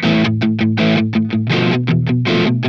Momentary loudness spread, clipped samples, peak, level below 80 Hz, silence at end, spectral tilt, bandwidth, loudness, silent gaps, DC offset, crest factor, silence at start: 2 LU; under 0.1%; -2 dBFS; -48 dBFS; 0 s; -7.5 dB/octave; 7 kHz; -15 LUFS; none; 0.4%; 12 dB; 0 s